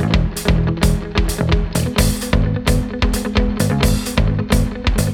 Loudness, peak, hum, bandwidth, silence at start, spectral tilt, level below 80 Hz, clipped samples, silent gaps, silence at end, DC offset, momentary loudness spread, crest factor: -18 LUFS; -2 dBFS; none; 17.5 kHz; 0 s; -5.5 dB/octave; -20 dBFS; under 0.1%; none; 0 s; under 0.1%; 2 LU; 16 dB